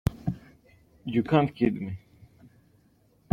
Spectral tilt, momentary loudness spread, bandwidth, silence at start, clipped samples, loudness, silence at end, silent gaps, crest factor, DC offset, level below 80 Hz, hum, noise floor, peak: -8.5 dB/octave; 18 LU; 16 kHz; 0.05 s; under 0.1%; -28 LUFS; 1.35 s; none; 22 dB; under 0.1%; -50 dBFS; none; -63 dBFS; -8 dBFS